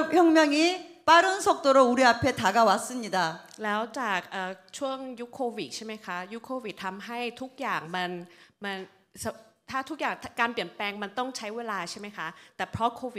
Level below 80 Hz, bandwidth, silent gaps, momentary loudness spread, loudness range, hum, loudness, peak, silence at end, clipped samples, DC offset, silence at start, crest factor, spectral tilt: -66 dBFS; 15.5 kHz; none; 16 LU; 12 LU; none; -27 LUFS; -6 dBFS; 0 s; under 0.1%; under 0.1%; 0 s; 20 dB; -3.5 dB/octave